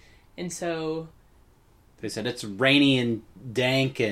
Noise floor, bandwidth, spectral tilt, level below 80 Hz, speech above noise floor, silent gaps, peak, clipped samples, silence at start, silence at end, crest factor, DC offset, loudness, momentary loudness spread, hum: -58 dBFS; 14.5 kHz; -5 dB/octave; -58 dBFS; 33 dB; none; -6 dBFS; under 0.1%; 0.35 s; 0 s; 22 dB; under 0.1%; -25 LUFS; 16 LU; none